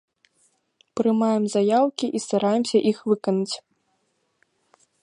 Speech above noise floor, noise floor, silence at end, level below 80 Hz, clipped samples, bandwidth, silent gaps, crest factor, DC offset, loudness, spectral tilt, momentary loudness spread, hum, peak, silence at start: 49 dB; -71 dBFS; 1.45 s; -74 dBFS; under 0.1%; 11 kHz; none; 16 dB; under 0.1%; -22 LUFS; -5.5 dB/octave; 7 LU; none; -8 dBFS; 0.95 s